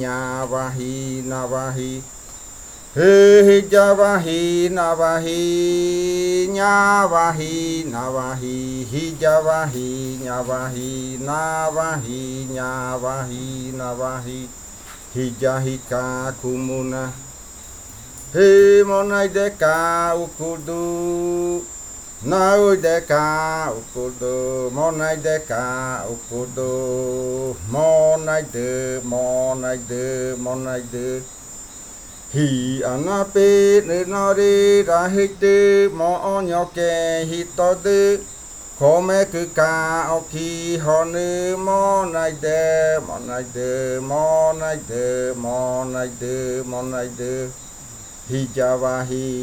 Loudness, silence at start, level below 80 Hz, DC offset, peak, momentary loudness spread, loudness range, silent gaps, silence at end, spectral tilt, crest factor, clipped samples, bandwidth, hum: -19 LUFS; 0 s; -46 dBFS; under 0.1%; -2 dBFS; 14 LU; 10 LU; none; 0 s; -5 dB/octave; 18 dB; under 0.1%; 17 kHz; none